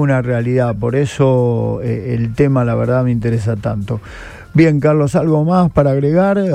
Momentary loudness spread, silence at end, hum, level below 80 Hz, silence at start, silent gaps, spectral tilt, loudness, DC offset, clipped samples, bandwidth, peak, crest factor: 8 LU; 0 s; none; -38 dBFS; 0 s; none; -8.5 dB/octave; -15 LUFS; under 0.1%; under 0.1%; 9.8 kHz; 0 dBFS; 14 dB